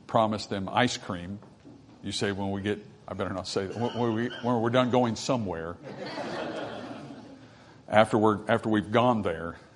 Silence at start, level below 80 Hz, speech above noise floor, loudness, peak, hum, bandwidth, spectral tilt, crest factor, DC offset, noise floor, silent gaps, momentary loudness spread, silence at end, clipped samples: 0.1 s; -64 dBFS; 24 dB; -28 LUFS; -2 dBFS; none; 11 kHz; -5.5 dB/octave; 26 dB; under 0.1%; -52 dBFS; none; 16 LU; 0.15 s; under 0.1%